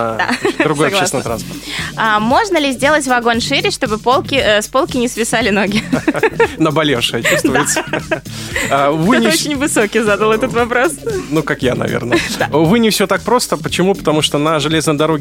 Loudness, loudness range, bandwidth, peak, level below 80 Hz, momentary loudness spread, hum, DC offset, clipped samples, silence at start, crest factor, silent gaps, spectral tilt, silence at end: -14 LUFS; 1 LU; 16.5 kHz; 0 dBFS; -40 dBFS; 6 LU; none; under 0.1%; under 0.1%; 0 s; 14 dB; none; -4 dB/octave; 0 s